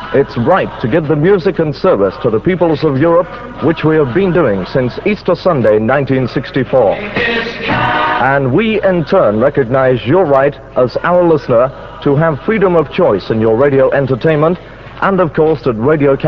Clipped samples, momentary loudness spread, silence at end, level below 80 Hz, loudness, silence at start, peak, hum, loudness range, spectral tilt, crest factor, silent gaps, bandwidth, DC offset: under 0.1%; 5 LU; 0 s; -38 dBFS; -12 LUFS; 0 s; 0 dBFS; none; 1 LU; -9 dB/octave; 12 dB; none; 6.4 kHz; 0.4%